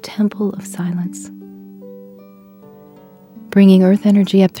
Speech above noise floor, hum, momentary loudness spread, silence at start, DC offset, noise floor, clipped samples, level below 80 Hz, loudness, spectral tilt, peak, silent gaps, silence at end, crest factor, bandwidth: 30 dB; none; 27 LU; 0.05 s; under 0.1%; -43 dBFS; under 0.1%; -64 dBFS; -14 LUFS; -7.5 dB/octave; 0 dBFS; none; 0 s; 16 dB; 17 kHz